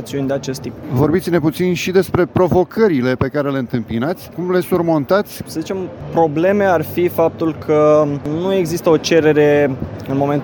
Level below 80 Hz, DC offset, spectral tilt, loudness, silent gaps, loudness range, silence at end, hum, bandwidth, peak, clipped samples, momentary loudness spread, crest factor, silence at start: -46 dBFS; under 0.1%; -6.5 dB/octave; -16 LUFS; none; 3 LU; 0 s; none; over 20 kHz; -2 dBFS; under 0.1%; 10 LU; 14 dB; 0 s